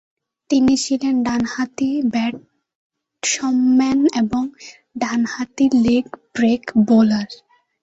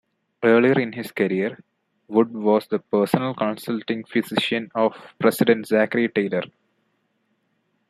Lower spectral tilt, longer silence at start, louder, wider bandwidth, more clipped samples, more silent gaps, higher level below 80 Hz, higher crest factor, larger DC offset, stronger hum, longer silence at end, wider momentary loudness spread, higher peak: second, -4.5 dB/octave vs -6 dB/octave; about the same, 0.5 s vs 0.4 s; first, -18 LUFS vs -22 LUFS; second, 8.2 kHz vs 15.5 kHz; neither; first, 2.75-2.90 s vs none; first, -54 dBFS vs -68 dBFS; second, 14 dB vs 20 dB; neither; neither; second, 0.45 s vs 1.45 s; about the same, 10 LU vs 8 LU; second, -6 dBFS vs -2 dBFS